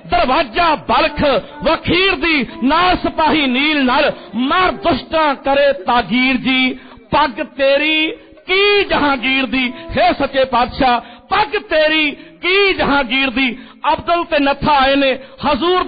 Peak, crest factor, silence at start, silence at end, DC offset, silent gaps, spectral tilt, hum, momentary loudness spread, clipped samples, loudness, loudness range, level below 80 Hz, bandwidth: -4 dBFS; 12 dB; 0.05 s; 0 s; under 0.1%; none; -1.5 dB/octave; none; 6 LU; under 0.1%; -14 LUFS; 1 LU; -38 dBFS; 5 kHz